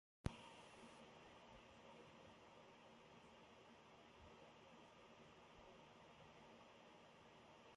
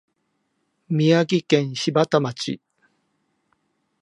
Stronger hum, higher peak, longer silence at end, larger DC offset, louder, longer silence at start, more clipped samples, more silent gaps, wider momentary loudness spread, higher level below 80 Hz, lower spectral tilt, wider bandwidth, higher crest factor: neither; second, -28 dBFS vs -2 dBFS; second, 0 s vs 1.45 s; neither; second, -63 LUFS vs -21 LUFS; second, 0.25 s vs 0.9 s; neither; neither; second, 4 LU vs 11 LU; about the same, -72 dBFS vs -70 dBFS; about the same, -5.5 dB/octave vs -6 dB/octave; about the same, 11 kHz vs 11 kHz; first, 34 dB vs 20 dB